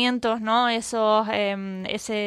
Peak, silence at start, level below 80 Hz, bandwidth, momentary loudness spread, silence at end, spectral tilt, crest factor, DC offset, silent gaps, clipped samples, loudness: -8 dBFS; 0 s; -62 dBFS; 13.5 kHz; 9 LU; 0 s; -3.5 dB/octave; 16 dB; under 0.1%; none; under 0.1%; -23 LUFS